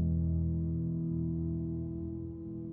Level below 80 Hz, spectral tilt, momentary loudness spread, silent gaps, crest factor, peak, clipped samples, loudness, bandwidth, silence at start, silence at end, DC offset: -44 dBFS; -16.5 dB/octave; 9 LU; none; 10 dB; -22 dBFS; under 0.1%; -35 LUFS; 1.3 kHz; 0 s; 0 s; under 0.1%